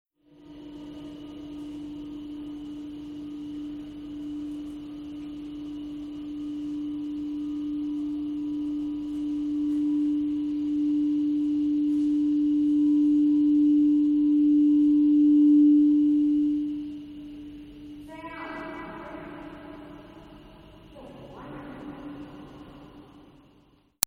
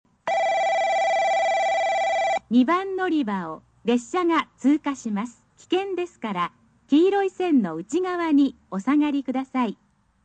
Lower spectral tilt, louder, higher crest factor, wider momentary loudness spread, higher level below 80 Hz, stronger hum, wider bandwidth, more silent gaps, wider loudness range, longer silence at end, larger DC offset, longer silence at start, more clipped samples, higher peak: about the same, -5.5 dB/octave vs -5 dB/octave; about the same, -24 LUFS vs -23 LUFS; first, 24 dB vs 14 dB; first, 22 LU vs 9 LU; first, -58 dBFS vs -66 dBFS; first, 50 Hz at -55 dBFS vs none; first, 16 kHz vs 9 kHz; neither; first, 23 LU vs 3 LU; first, 0.85 s vs 0.5 s; neither; first, 0.45 s vs 0.25 s; neither; first, -2 dBFS vs -10 dBFS